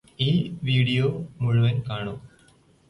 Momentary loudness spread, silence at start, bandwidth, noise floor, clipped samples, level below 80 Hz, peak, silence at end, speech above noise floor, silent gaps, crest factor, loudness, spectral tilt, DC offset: 10 LU; 0.2 s; 11 kHz; -58 dBFS; under 0.1%; -54 dBFS; -10 dBFS; 0.6 s; 34 dB; none; 14 dB; -24 LUFS; -7.5 dB/octave; under 0.1%